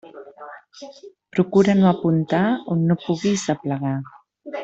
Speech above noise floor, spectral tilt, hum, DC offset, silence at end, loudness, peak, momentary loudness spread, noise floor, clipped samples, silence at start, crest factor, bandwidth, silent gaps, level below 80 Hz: 21 dB; -7 dB/octave; none; under 0.1%; 0 s; -20 LUFS; -4 dBFS; 23 LU; -41 dBFS; under 0.1%; 0.05 s; 18 dB; 8 kHz; none; -60 dBFS